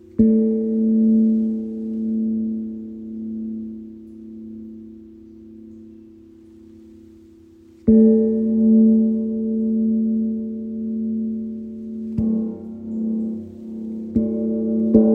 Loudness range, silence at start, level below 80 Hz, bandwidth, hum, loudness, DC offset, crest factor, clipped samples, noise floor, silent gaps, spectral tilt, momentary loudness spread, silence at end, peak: 18 LU; 0.15 s; -48 dBFS; 1.2 kHz; none; -20 LUFS; under 0.1%; 20 dB; under 0.1%; -47 dBFS; none; -13 dB/octave; 21 LU; 0 s; -2 dBFS